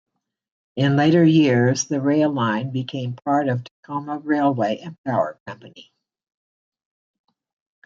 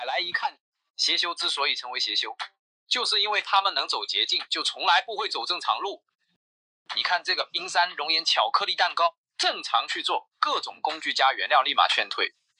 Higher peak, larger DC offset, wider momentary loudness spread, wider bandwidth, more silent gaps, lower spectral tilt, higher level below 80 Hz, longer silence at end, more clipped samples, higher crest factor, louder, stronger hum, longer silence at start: about the same, -6 dBFS vs -4 dBFS; neither; first, 15 LU vs 7 LU; second, 7.6 kHz vs 11 kHz; second, 3.71-3.83 s, 4.98-5.04 s, 5.40-5.46 s vs 0.60-0.72 s, 0.90-0.94 s, 2.59-2.86 s, 6.15-6.19 s, 6.36-6.85 s, 9.18-9.24 s; first, -6 dB/octave vs 1 dB/octave; first, -66 dBFS vs under -90 dBFS; first, 2.05 s vs 0.3 s; neither; second, 16 dB vs 22 dB; first, -20 LUFS vs -24 LUFS; neither; first, 0.75 s vs 0 s